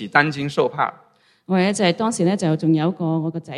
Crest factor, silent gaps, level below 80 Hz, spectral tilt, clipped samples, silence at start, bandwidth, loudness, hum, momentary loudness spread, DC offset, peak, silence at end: 20 dB; none; -64 dBFS; -5.5 dB/octave; under 0.1%; 0 s; 11.5 kHz; -20 LUFS; none; 6 LU; under 0.1%; 0 dBFS; 0 s